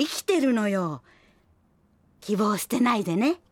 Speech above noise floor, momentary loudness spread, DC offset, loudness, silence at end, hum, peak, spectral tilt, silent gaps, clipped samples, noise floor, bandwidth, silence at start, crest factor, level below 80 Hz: 39 dB; 9 LU; under 0.1%; -25 LUFS; 0.15 s; none; -12 dBFS; -5 dB/octave; none; under 0.1%; -63 dBFS; 17.5 kHz; 0 s; 16 dB; -68 dBFS